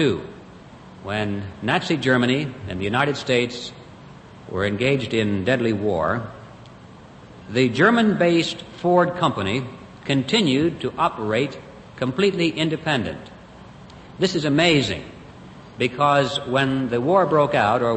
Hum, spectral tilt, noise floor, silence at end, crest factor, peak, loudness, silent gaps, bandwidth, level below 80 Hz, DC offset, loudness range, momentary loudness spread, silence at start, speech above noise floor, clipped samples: none; -5.5 dB/octave; -43 dBFS; 0 s; 18 dB; -2 dBFS; -21 LUFS; none; 8.8 kHz; -54 dBFS; under 0.1%; 4 LU; 15 LU; 0 s; 23 dB; under 0.1%